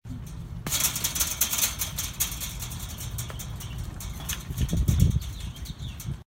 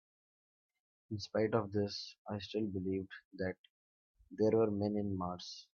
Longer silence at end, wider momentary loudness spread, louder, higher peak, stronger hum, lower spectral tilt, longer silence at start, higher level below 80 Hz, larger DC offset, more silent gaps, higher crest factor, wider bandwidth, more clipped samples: about the same, 0.05 s vs 0.15 s; about the same, 14 LU vs 13 LU; first, -28 LUFS vs -37 LUFS; first, -6 dBFS vs -18 dBFS; neither; second, -3 dB/octave vs -6 dB/octave; second, 0.05 s vs 1.1 s; first, -36 dBFS vs -74 dBFS; neither; second, none vs 2.18-2.25 s, 3.25-3.31 s, 3.59-3.64 s, 3.70-4.15 s; about the same, 22 dB vs 22 dB; first, 16.5 kHz vs 7.2 kHz; neither